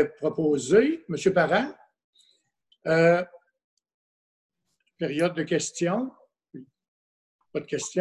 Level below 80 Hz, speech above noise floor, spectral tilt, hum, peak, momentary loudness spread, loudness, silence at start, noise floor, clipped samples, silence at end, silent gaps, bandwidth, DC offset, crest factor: -66 dBFS; 45 dB; -5 dB/octave; none; -8 dBFS; 15 LU; -25 LUFS; 0 s; -69 dBFS; under 0.1%; 0 s; 2.04-2.13 s, 3.64-3.77 s, 3.94-4.50 s, 6.88-7.39 s; 11.5 kHz; under 0.1%; 20 dB